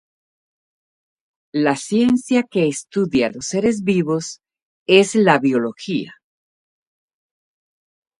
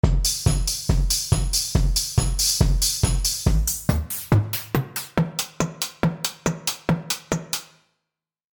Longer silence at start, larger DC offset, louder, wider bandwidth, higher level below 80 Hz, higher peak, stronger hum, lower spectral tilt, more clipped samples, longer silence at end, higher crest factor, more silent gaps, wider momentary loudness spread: first, 1.55 s vs 0.05 s; neither; first, -18 LUFS vs -23 LUFS; second, 11.5 kHz vs 19.5 kHz; second, -60 dBFS vs -28 dBFS; first, 0 dBFS vs -6 dBFS; neither; about the same, -5 dB/octave vs -4 dB/octave; neither; first, 2.1 s vs 0.9 s; about the same, 20 dB vs 18 dB; first, 4.62-4.86 s vs none; first, 11 LU vs 6 LU